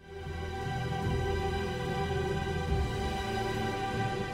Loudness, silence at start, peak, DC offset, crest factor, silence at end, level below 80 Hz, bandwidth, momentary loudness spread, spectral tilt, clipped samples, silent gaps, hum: -33 LUFS; 0 s; -20 dBFS; under 0.1%; 12 dB; 0 s; -40 dBFS; 16 kHz; 4 LU; -6 dB/octave; under 0.1%; none; none